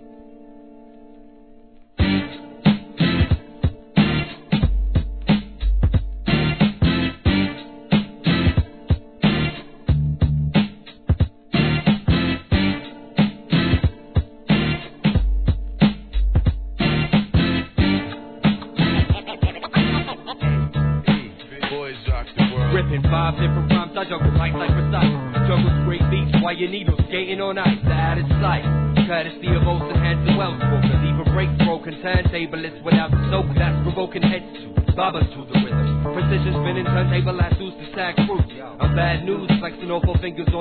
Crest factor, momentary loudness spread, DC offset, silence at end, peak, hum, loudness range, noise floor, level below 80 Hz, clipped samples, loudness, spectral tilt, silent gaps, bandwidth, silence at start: 16 dB; 7 LU; 0.2%; 0 s; -4 dBFS; none; 2 LU; -46 dBFS; -28 dBFS; under 0.1%; -21 LUFS; -10.5 dB/octave; none; 4.5 kHz; 0 s